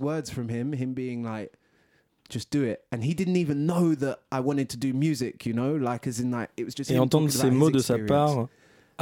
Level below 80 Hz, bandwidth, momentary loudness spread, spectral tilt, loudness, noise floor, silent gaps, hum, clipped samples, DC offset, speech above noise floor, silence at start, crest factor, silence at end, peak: -60 dBFS; 18 kHz; 11 LU; -6.5 dB/octave; -27 LUFS; -66 dBFS; none; none; under 0.1%; under 0.1%; 40 dB; 0 s; 20 dB; 0 s; -8 dBFS